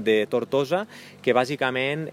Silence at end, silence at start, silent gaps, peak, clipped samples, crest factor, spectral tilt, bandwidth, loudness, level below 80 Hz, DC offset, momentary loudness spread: 0 s; 0 s; none; -6 dBFS; under 0.1%; 18 dB; -5.5 dB/octave; 15.5 kHz; -24 LUFS; -72 dBFS; under 0.1%; 6 LU